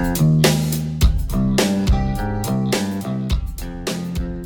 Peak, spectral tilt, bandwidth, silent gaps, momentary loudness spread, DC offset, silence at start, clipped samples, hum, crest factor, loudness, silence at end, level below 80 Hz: -4 dBFS; -5.5 dB/octave; over 20 kHz; none; 10 LU; under 0.1%; 0 s; under 0.1%; none; 14 dB; -20 LUFS; 0 s; -24 dBFS